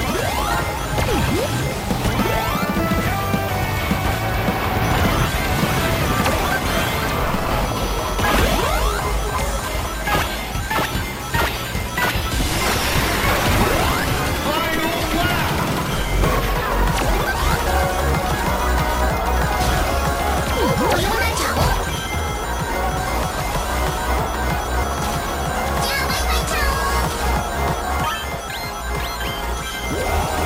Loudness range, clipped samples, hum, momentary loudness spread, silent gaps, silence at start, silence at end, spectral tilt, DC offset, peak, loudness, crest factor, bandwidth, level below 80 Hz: 3 LU; under 0.1%; none; 5 LU; none; 0 s; 0 s; -4.5 dB/octave; under 0.1%; -4 dBFS; -20 LUFS; 16 dB; 16 kHz; -26 dBFS